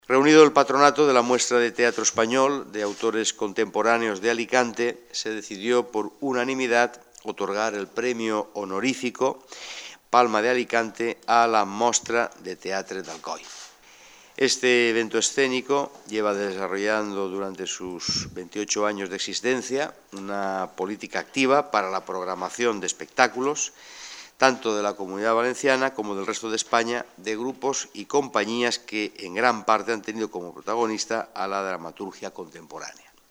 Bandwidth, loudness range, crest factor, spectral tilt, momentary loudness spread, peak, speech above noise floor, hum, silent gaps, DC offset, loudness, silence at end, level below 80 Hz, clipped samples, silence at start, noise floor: 16 kHz; 4 LU; 24 dB; -2.5 dB/octave; 14 LU; 0 dBFS; 27 dB; none; none; under 0.1%; -24 LUFS; 0.4 s; -68 dBFS; under 0.1%; 0.1 s; -51 dBFS